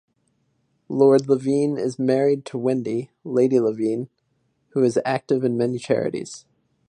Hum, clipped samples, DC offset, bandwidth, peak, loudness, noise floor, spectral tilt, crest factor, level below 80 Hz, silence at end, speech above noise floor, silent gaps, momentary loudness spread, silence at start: none; under 0.1%; under 0.1%; 10 kHz; -4 dBFS; -22 LUFS; -69 dBFS; -7 dB/octave; 18 dB; -68 dBFS; 0.5 s; 48 dB; none; 12 LU; 0.9 s